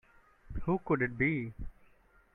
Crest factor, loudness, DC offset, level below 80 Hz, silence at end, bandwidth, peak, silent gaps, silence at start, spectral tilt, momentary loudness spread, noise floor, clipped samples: 18 dB; -33 LUFS; under 0.1%; -50 dBFS; 0.65 s; 3.9 kHz; -16 dBFS; none; 0.45 s; -10 dB/octave; 18 LU; -64 dBFS; under 0.1%